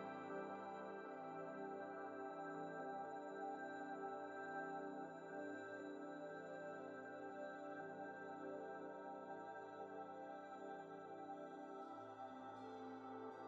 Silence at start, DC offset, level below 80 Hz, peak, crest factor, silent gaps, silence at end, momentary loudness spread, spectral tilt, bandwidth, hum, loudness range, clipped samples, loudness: 0 s; under 0.1%; under -90 dBFS; -38 dBFS; 14 dB; none; 0 s; 4 LU; -4.5 dB/octave; 7.6 kHz; none; 4 LU; under 0.1%; -52 LUFS